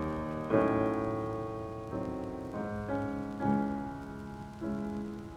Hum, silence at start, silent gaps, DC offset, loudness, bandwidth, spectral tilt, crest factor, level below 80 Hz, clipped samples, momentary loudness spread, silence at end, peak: none; 0 s; none; under 0.1%; -35 LUFS; 12.5 kHz; -8.5 dB/octave; 20 dB; -52 dBFS; under 0.1%; 11 LU; 0 s; -14 dBFS